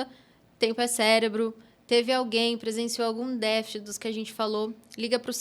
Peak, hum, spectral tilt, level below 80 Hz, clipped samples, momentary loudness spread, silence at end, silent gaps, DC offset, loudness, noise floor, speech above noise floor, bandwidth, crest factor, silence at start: -8 dBFS; none; -2.5 dB/octave; -74 dBFS; under 0.1%; 11 LU; 0 s; none; under 0.1%; -27 LUFS; -56 dBFS; 29 dB; 15.5 kHz; 20 dB; 0 s